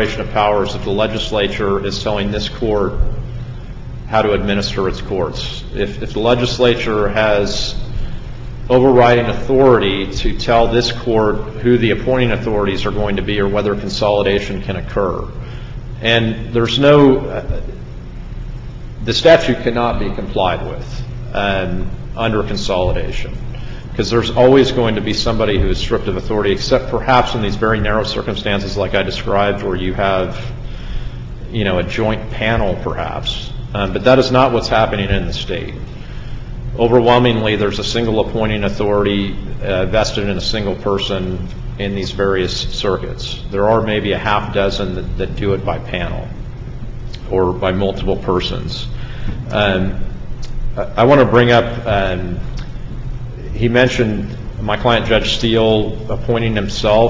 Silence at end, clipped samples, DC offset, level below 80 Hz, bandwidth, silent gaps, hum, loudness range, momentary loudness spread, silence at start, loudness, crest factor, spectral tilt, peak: 0 s; under 0.1%; under 0.1%; -28 dBFS; 7.8 kHz; none; none; 5 LU; 17 LU; 0 s; -16 LUFS; 16 dB; -6 dB/octave; 0 dBFS